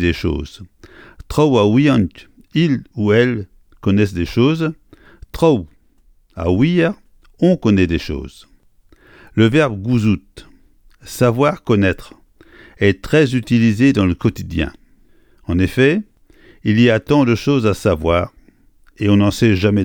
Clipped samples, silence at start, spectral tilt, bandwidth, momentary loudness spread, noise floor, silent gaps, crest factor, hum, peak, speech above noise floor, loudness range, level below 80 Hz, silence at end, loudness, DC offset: under 0.1%; 0 s; -7 dB/octave; 18.5 kHz; 12 LU; -52 dBFS; none; 16 dB; none; 0 dBFS; 37 dB; 3 LU; -38 dBFS; 0 s; -16 LUFS; under 0.1%